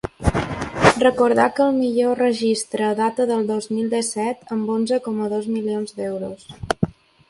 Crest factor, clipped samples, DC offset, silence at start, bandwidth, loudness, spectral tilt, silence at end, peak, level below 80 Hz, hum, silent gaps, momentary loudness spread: 20 dB; under 0.1%; under 0.1%; 0.05 s; 11.5 kHz; -21 LUFS; -5 dB/octave; 0.4 s; 0 dBFS; -40 dBFS; none; none; 10 LU